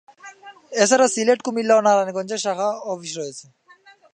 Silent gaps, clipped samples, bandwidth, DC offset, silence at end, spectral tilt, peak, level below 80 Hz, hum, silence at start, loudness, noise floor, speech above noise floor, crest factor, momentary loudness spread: none; under 0.1%; 11.5 kHz; under 0.1%; 0.75 s; -3 dB/octave; -2 dBFS; -80 dBFS; none; 0.25 s; -20 LUFS; -51 dBFS; 32 dB; 18 dB; 15 LU